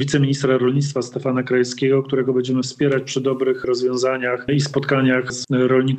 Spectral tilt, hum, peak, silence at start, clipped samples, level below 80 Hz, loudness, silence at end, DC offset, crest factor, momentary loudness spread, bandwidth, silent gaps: -6 dB/octave; none; -6 dBFS; 0 s; under 0.1%; -58 dBFS; -19 LUFS; 0 s; under 0.1%; 14 dB; 5 LU; 9 kHz; none